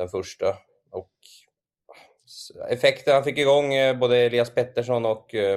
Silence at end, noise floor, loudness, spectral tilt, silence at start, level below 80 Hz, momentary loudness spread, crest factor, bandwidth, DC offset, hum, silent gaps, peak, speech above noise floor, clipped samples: 0 s; -55 dBFS; -22 LUFS; -5 dB/octave; 0 s; -66 dBFS; 19 LU; 20 dB; 13 kHz; under 0.1%; none; none; -4 dBFS; 32 dB; under 0.1%